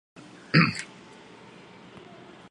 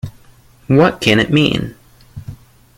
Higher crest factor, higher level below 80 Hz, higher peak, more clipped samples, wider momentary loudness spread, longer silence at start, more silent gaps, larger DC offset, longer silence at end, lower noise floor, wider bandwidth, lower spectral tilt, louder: first, 24 dB vs 16 dB; second, -66 dBFS vs -42 dBFS; second, -6 dBFS vs 0 dBFS; neither; first, 26 LU vs 22 LU; first, 0.55 s vs 0.05 s; neither; neither; first, 1.65 s vs 0.45 s; about the same, -49 dBFS vs -46 dBFS; second, 11 kHz vs 16.5 kHz; about the same, -5.5 dB/octave vs -6 dB/octave; second, -24 LUFS vs -13 LUFS